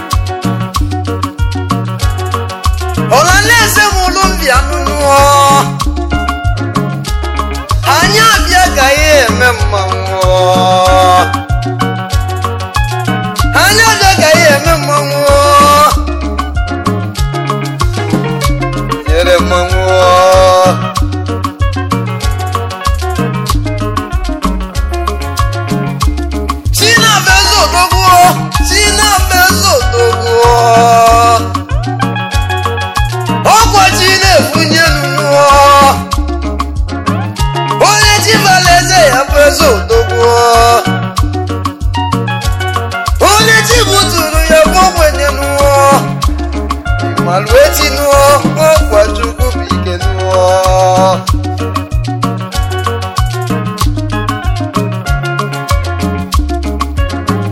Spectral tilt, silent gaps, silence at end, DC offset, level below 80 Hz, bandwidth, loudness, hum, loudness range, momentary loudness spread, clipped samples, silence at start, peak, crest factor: -4 dB/octave; none; 0 s; under 0.1%; -18 dBFS; 17 kHz; -9 LUFS; none; 8 LU; 10 LU; 0.4%; 0 s; 0 dBFS; 8 dB